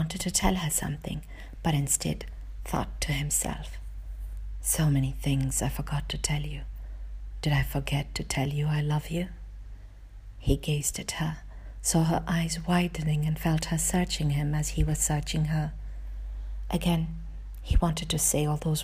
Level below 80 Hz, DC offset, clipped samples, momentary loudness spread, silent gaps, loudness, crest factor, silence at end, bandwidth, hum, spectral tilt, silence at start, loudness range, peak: -36 dBFS; under 0.1%; under 0.1%; 16 LU; none; -28 LUFS; 18 dB; 0 s; 15.5 kHz; none; -4.5 dB/octave; 0 s; 3 LU; -10 dBFS